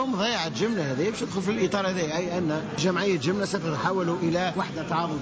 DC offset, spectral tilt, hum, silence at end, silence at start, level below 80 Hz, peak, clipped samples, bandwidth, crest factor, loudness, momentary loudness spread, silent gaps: under 0.1%; -5 dB/octave; none; 0 s; 0 s; -56 dBFS; -14 dBFS; under 0.1%; 8 kHz; 12 dB; -26 LUFS; 3 LU; none